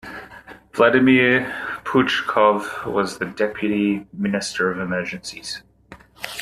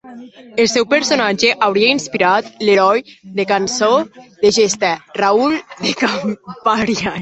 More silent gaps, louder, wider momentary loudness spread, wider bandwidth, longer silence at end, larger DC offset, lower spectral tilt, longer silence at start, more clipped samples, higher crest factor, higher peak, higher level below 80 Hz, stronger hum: neither; second, -20 LUFS vs -15 LUFS; first, 17 LU vs 8 LU; first, 13.5 kHz vs 8.4 kHz; about the same, 0 s vs 0 s; neither; first, -5 dB/octave vs -3 dB/octave; about the same, 0.05 s vs 0.05 s; neither; about the same, 18 dB vs 16 dB; about the same, -2 dBFS vs 0 dBFS; about the same, -56 dBFS vs -54 dBFS; neither